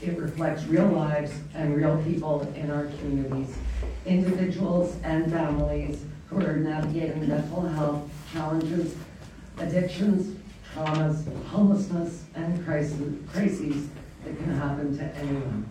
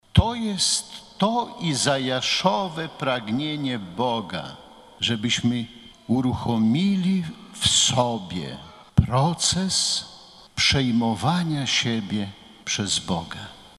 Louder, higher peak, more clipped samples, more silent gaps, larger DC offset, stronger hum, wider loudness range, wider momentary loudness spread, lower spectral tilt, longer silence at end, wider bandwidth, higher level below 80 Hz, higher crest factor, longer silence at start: second, -28 LUFS vs -23 LUFS; second, -10 dBFS vs -2 dBFS; neither; neither; neither; neither; about the same, 3 LU vs 4 LU; second, 10 LU vs 14 LU; first, -8 dB/octave vs -4 dB/octave; about the same, 0 s vs 0.1 s; second, 11 kHz vs 13 kHz; about the same, -42 dBFS vs -42 dBFS; about the same, 18 dB vs 22 dB; second, 0 s vs 0.15 s